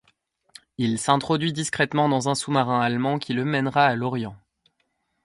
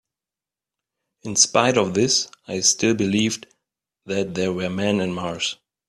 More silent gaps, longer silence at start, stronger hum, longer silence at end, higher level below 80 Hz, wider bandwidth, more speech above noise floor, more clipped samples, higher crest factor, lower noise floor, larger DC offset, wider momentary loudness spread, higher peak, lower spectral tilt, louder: neither; second, 0.8 s vs 1.25 s; neither; first, 0.9 s vs 0.35 s; about the same, -62 dBFS vs -60 dBFS; about the same, 11.5 kHz vs 12.5 kHz; second, 50 dB vs 68 dB; neither; about the same, 22 dB vs 22 dB; second, -73 dBFS vs -90 dBFS; neither; about the same, 8 LU vs 10 LU; about the same, -2 dBFS vs -2 dBFS; first, -5 dB/octave vs -3 dB/octave; about the same, -23 LUFS vs -21 LUFS